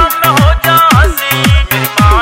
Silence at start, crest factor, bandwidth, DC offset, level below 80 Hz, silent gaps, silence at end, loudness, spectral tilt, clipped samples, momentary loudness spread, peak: 0 s; 8 dB; 17 kHz; under 0.1%; -14 dBFS; none; 0 s; -8 LUFS; -4.5 dB/octave; 0.9%; 4 LU; 0 dBFS